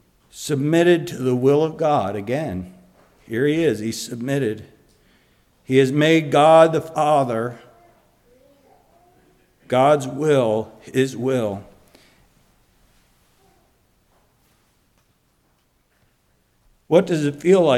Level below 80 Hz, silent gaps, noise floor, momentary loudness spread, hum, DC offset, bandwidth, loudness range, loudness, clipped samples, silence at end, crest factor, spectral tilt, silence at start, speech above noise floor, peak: -60 dBFS; none; -64 dBFS; 12 LU; none; under 0.1%; 15.5 kHz; 9 LU; -19 LUFS; under 0.1%; 0 s; 20 dB; -6 dB/octave; 0.35 s; 46 dB; -2 dBFS